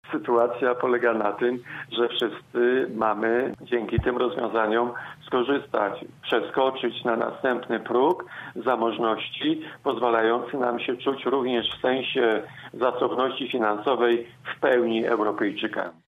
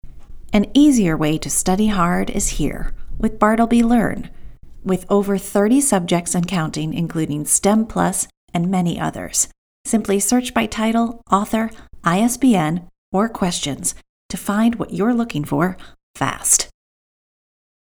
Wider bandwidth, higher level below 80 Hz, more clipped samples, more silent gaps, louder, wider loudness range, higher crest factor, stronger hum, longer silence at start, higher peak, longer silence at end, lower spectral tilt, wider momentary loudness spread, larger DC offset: second, 5.2 kHz vs over 20 kHz; second, -52 dBFS vs -36 dBFS; neither; second, none vs 8.37-8.48 s, 9.58-9.84 s, 12.98-13.12 s, 14.09-14.29 s, 16.03-16.14 s; second, -25 LUFS vs -18 LUFS; about the same, 1 LU vs 2 LU; about the same, 16 dB vs 18 dB; neither; about the same, 0.05 s vs 0.05 s; second, -8 dBFS vs 0 dBFS; second, 0.2 s vs 1.2 s; first, -7 dB/octave vs -4.5 dB/octave; second, 6 LU vs 9 LU; neither